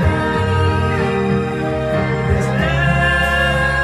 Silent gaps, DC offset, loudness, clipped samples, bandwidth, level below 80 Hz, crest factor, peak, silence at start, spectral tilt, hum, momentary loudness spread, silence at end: none; under 0.1%; -16 LUFS; under 0.1%; 13.5 kHz; -28 dBFS; 12 dB; -4 dBFS; 0 s; -6.5 dB/octave; none; 4 LU; 0 s